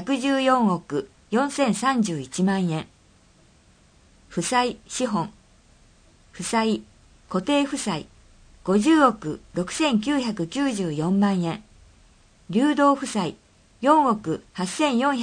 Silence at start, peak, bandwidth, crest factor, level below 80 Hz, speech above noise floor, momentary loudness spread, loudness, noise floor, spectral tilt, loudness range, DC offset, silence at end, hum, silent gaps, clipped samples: 0 s; -4 dBFS; 10 kHz; 20 dB; -56 dBFS; 34 dB; 12 LU; -23 LUFS; -56 dBFS; -5 dB/octave; 5 LU; under 0.1%; 0 s; none; none; under 0.1%